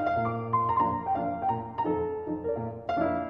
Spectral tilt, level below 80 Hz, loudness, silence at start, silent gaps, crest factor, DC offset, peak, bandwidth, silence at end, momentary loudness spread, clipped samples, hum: -9.5 dB/octave; -56 dBFS; -29 LUFS; 0 s; none; 14 dB; under 0.1%; -14 dBFS; 6.2 kHz; 0 s; 6 LU; under 0.1%; none